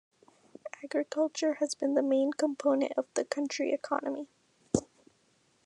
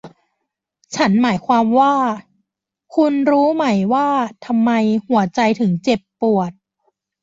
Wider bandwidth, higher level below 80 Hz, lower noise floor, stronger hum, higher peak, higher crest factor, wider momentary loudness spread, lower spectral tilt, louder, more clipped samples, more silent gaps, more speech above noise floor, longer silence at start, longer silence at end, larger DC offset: first, 11 kHz vs 7.8 kHz; second, -68 dBFS vs -60 dBFS; second, -70 dBFS vs -77 dBFS; neither; second, -10 dBFS vs -4 dBFS; first, 22 dB vs 14 dB; first, 12 LU vs 6 LU; second, -4.5 dB/octave vs -6.5 dB/octave; second, -31 LUFS vs -17 LUFS; neither; neither; second, 39 dB vs 61 dB; first, 0.65 s vs 0.05 s; about the same, 0.8 s vs 0.7 s; neither